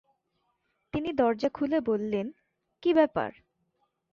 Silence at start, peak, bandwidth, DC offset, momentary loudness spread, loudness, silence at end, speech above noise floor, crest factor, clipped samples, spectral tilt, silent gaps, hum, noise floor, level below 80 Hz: 0.95 s; -10 dBFS; 7 kHz; under 0.1%; 11 LU; -28 LUFS; 0.85 s; 50 dB; 20 dB; under 0.1%; -7.5 dB/octave; none; none; -77 dBFS; -62 dBFS